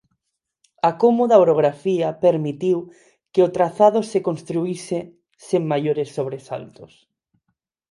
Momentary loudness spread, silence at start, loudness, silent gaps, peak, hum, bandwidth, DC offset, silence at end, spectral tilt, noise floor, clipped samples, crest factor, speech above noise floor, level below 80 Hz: 13 LU; 0.85 s; -20 LUFS; none; 0 dBFS; none; 11.5 kHz; under 0.1%; 1.05 s; -7 dB/octave; -79 dBFS; under 0.1%; 20 dB; 59 dB; -66 dBFS